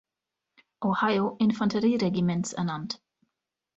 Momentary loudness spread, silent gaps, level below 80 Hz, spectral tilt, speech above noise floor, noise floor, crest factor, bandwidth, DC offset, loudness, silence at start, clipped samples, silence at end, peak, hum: 9 LU; none; -64 dBFS; -6 dB/octave; 61 dB; -87 dBFS; 16 dB; 8.2 kHz; under 0.1%; -27 LUFS; 0.8 s; under 0.1%; 0.8 s; -12 dBFS; none